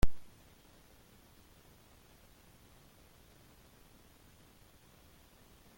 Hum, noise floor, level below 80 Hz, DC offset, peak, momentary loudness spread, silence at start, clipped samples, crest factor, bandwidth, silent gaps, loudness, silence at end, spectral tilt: none; -62 dBFS; -48 dBFS; under 0.1%; -14 dBFS; 1 LU; 0.05 s; under 0.1%; 24 dB; 17 kHz; none; -56 LUFS; 5.55 s; -5.5 dB/octave